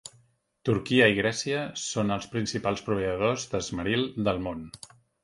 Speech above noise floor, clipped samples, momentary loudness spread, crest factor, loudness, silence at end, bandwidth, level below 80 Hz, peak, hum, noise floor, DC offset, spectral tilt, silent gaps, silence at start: 37 dB; under 0.1%; 14 LU; 22 dB; -27 LUFS; 0.5 s; 11.5 kHz; -54 dBFS; -6 dBFS; none; -65 dBFS; under 0.1%; -4.5 dB/octave; none; 0.05 s